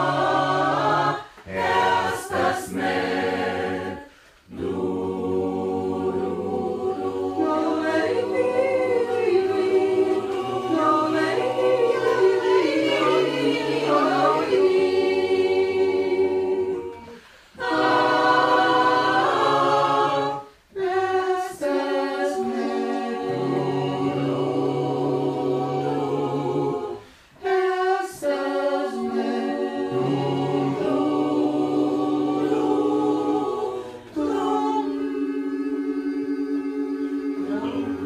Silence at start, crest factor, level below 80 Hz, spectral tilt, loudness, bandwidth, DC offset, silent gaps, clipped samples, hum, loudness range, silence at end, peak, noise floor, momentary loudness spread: 0 s; 16 dB; -62 dBFS; -6 dB/octave; -23 LUFS; 13.5 kHz; under 0.1%; none; under 0.1%; none; 6 LU; 0 s; -6 dBFS; -48 dBFS; 8 LU